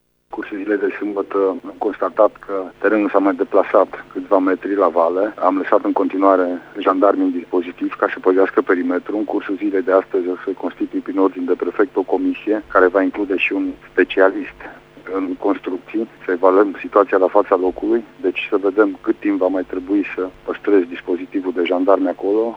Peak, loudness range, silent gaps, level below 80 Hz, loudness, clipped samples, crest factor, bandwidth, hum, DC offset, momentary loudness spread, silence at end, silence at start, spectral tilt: 0 dBFS; 3 LU; none; -56 dBFS; -18 LUFS; under 0.1%; 18 dB; 5.6 kHz; none; under 0.1%; 9 LU; 0 s; 0.3 s; -7 dB/octave